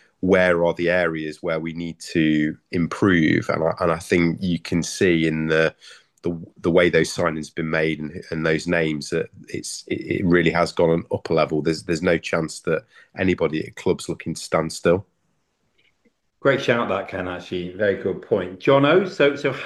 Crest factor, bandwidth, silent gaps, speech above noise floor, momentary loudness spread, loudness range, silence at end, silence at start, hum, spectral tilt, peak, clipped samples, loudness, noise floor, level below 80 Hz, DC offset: 18 dB; 12.5 kHz; none; 49 dB; 11 LU; 4 LU; 0 s; 0.25 s; none; -5.5 dB/octave; -4 dBFS; under 0.1%; -22 LUFS; -70 dBFS; -52 dBFS; under 0.1%